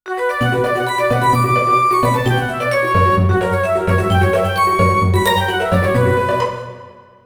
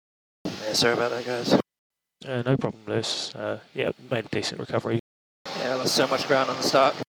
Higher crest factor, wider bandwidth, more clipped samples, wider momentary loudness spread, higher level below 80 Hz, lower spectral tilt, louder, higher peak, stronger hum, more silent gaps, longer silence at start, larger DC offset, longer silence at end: second, 16 dB vs 22 dB; about the same, over 20 kHz vs over 20 kHz; neither; second, 4 LU vs 11 LU; first, -38 dBFS vs -66 dBFS; first, -6 dB/octave vs -4 dB/octave; first, -15 LUFS vs -25 LUFS; first, 0 dBFS vs -6 dBFS; neither; second, none vs 1.78-1.90 s, 5.00-5.45 s; second, 0.05 s vs 0.45 s; neither; first, 0.35 s vs 0.1 s